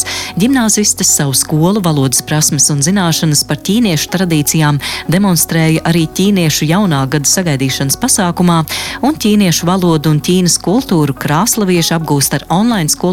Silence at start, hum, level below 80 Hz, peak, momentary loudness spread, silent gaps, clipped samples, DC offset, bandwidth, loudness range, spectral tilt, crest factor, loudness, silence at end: 0 s; none; -40 dBFS; 0 dBFS; 4 LU; none; under 0.1%; 0.1%; 17 kHz; 1 LU; -4 dB/octave; 12 dB; -11 LUFS; 0 s